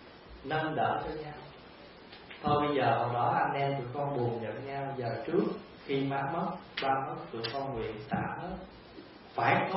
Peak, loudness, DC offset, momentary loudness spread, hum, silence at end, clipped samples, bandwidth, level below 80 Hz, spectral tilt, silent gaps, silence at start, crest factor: -12 dBFS; -33 LUFS; under 0.1%; 21 LU; none; 0 s; under 0.1%; 5.6 kHz; -60 dBFS; -4.5 dB/octave; none; 0 s; 20 dB